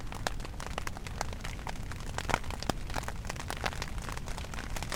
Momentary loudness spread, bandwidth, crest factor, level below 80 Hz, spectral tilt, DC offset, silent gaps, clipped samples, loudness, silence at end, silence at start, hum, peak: 7 LU; 18 kHz; 30 dB; -40 dBFS; -4 dB/octave; under 0.1%; none; under 0.1%; -38 LUFS; 0 s; 0 s; none; -6 dBFS